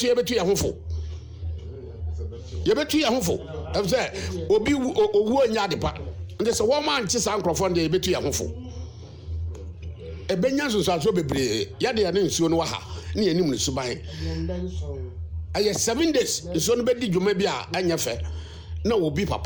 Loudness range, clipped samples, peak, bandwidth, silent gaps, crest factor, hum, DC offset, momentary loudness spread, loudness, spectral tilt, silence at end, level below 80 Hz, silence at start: 4 LU; under 0.1%; -12 dBFS; over 20 kHz; none; 12 dB; none; under 0.1%; 14 LU; -24 LUFS; -4.5 dB/octave; 0 s; -40 dBFS; 0 s